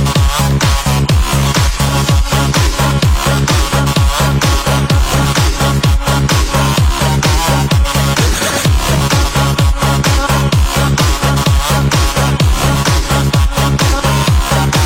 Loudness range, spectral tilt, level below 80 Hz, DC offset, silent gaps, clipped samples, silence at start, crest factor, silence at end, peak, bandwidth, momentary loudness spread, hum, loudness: 0 LU; -4.5 dB/octave; -16 dBFS; 0.2%; none; under 0.1%; 0 s; 10 dB; 0 s; 0 dBFS; 17.5 kHz; 1 LU; none; -12 LUFS